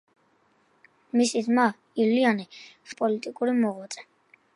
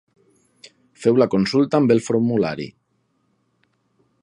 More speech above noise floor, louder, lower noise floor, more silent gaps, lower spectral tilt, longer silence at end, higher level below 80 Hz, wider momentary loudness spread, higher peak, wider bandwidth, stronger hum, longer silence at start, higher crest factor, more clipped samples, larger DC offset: second, 41 dB vs 50 dB; second, -25 LUFS vs -19 LUFS; about the same, -66 dBFS vs -68 dBFS; neither; second, -4.5 dB/octave vs -6.5 dB/octave; second, 0.55 s vs 1.5 s; second, -80 dBFS vs -60 dBFS; first, 18 LU vs 9 LU; second, -8 dBFS vs -2 dBFS; about the same, 11.5 kHz vs 11 kHz; neither; first, 1.15 s vs 1 s; about the same, 20 dB vs 20 dB; neither; neither